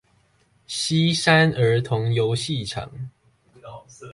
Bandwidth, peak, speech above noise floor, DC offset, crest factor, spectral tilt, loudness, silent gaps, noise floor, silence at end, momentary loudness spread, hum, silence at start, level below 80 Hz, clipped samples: 11.5 kHz; -4 dBFS; 41 dB; under 0.1%; 18 dB; -5 dB/octave; -21 LUFS; none; -62 dBFS; 0 s; 25 LU; none; 0.7 s; -54 dBFS; under 0.1%